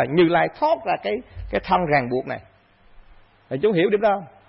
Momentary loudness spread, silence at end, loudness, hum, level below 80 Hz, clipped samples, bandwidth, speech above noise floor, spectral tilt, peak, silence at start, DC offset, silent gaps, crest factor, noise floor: 12 LU; 0.2 s; -21 LUFS; none; -46 dBFS; under 0.1%; 5.8 kHz; 30 dB; -11 dB/octave; -8 dBFS; 0 s; under 0.1%; none; 14 dB; -51 dBFS